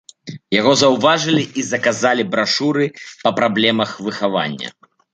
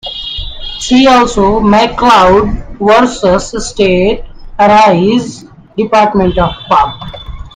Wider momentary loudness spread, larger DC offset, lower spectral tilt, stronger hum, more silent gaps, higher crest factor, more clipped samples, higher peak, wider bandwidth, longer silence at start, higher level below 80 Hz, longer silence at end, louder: second, 10 LU vs 15 LU; neither; about the same, -4 dB/octave vs -5 dB/octave; neither; neither; first, 16 dB vs 10 dB; second, under 0.1% vs 0.4%; about the same, -2 dBFS vs 0 dBFS; second, 9.4 kHz vs 10.5 kHz; first, 0.25 s vs 0.05 s; second, -60 dBFS vs -26 dBFS; first, 0.45 s vs 0.05 s; second, -17 LUFS vs -9 LUFS